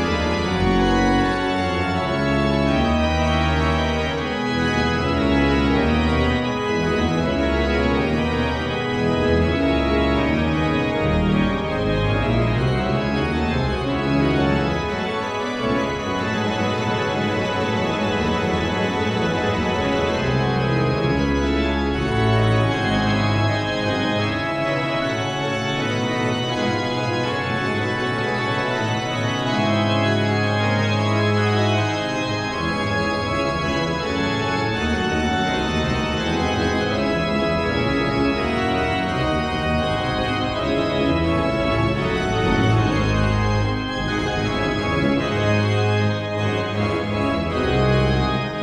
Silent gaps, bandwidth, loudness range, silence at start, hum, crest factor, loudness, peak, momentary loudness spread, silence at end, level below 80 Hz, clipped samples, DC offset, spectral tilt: none; 10.5 kHz; 2 LU; 0 s; none; 14 dB; -21 LUFS; -6 dBFS; 4 LU; 0 s; -32 dBFS; under 0.1%; under 0.1%; -6 dB/octave